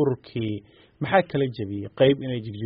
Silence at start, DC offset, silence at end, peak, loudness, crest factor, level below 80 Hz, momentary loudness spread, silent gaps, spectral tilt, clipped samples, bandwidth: 0 s; under 0.1%; 0 s; -6 dBFS; -25 LUFS; 20 dB; -58 dBFS; 12 LU; none; -5.5 dB/octave; under 0.1%; 5.4 kHz